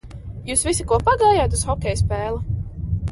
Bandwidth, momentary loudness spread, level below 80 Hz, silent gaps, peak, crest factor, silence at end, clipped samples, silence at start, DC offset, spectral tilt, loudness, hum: 11.5 kHz; 12 LU; -30 dBFS; none; -4 dBFS; 16 dB; 0 s; under 0.1%; 0.05 s; under 0.1%; -4.5 dB/octave; -20 LUFS; none